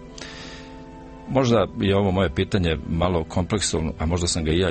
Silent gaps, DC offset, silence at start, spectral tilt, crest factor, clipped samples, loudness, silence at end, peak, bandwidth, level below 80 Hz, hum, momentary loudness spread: none; under 0.1%; 0 s; -5 dB/octave; 16 dB; under 0.1%; -22 LUFS; 0 s; -6 dBFS; 8.8 kHz; -36 dBFS; none; 19 LU